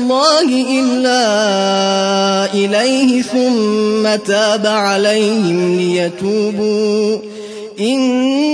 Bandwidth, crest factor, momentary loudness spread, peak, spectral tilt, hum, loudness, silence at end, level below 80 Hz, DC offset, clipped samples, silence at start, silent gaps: 11 kHz; 14 dB; 4 LU; 0 dBFS; -4 dB/octave; none; -13 LUFS; 0 s; -66 dBFS; under 0.1%; under 0.1%; 0 s; none